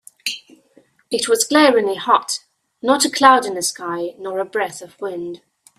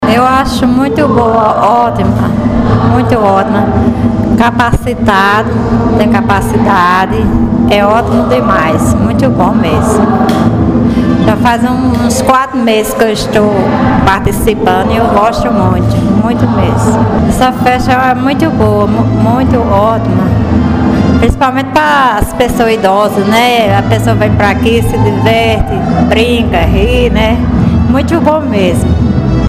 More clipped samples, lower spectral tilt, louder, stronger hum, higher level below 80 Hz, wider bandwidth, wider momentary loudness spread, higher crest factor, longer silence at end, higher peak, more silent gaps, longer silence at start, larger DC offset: second, under 0.1% vs 0.3%; second, -2 dB/octave vs -6.5 dB/octave; second, -18 LUFS vs -9 LUFS; neither; second, -66 dBFS vs -22 dBFS; about the same, 15.5 kHz vs 16 kHz; first, 16 LU vs 2 LU; first, 18 dB vs 8 dB; first, 0.4 s vs 0 s; about the same, 0 dBFS vs 0 dBFS; neither; first, 0.25 s vs 0 s; second, under 0.1% vs 0.5%